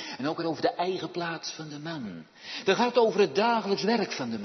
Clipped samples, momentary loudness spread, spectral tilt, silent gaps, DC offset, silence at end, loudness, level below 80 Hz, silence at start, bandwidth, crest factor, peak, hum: under 0.1%; 14 LU; -4.5 dB/octave; none; under 0.1%; 0 s; -28 LUFS; -76 dBFS; 0 s; 6.4 kHz; 20 dB; -8 dBFS; none